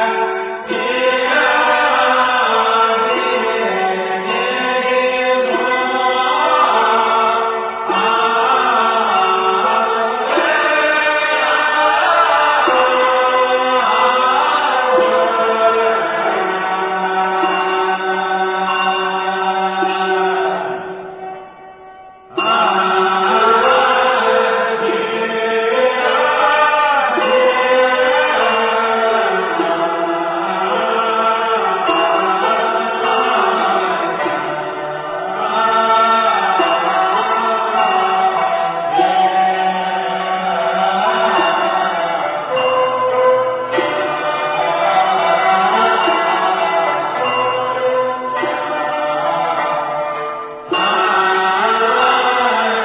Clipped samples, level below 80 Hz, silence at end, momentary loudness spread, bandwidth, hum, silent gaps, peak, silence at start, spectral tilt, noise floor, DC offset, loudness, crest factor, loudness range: under 0.1%; -58 dBFS; 0 s; 6 LU; 4 kHz; none; none; -2 dBFS; 0 s; -7 dB/octave; -38 dBFS; under 0.1%; -14 LUFS; 14 dB; 4 LU